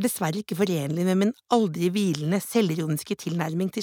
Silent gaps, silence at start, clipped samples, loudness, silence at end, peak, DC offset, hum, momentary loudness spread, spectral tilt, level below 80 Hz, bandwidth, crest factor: none; 0 s; under 0.1%; -25 LUFS; 0 s; -8 dBFS; under 0.1%; none; 5 LU; -6 dB/octave; -70 dBFS; 19.5 kHz; 18 dB